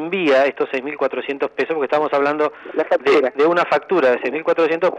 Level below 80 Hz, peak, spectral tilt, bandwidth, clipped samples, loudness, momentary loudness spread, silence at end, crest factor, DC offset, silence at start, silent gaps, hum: -70 dBFS; -6 dBFS; -5.5 dB/octave; 8.8 kHz; under 0.1%; -18 LUFS; 7 LU; 0 s; 12 dB; under 0.1%; 0 s; none; none